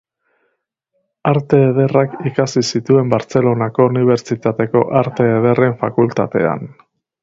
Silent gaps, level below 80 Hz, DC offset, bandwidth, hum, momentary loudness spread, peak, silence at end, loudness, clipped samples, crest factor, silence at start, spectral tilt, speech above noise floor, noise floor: none; -54 dBFS; under 0.1%; 7.8 kHz; none; 6 LU; 0 dBFS; 0.55 s; -15 LUFS; under 0.1%; 16 dB; 1.25 s; -7 dB/octave; 55 dB; -69 dBFS